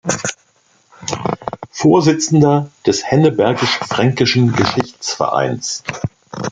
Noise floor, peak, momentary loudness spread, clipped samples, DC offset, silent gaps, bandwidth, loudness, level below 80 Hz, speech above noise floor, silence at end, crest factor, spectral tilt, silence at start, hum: -56 dBFS; 0 dBFS; 13 LU; under 0.1%; under 0.1%; none; 9.4 kHz; -15 LUFS; -50 dBFS; 42 dB; 0 s; 16 dB; -5 dB/octave; 0.05 s; none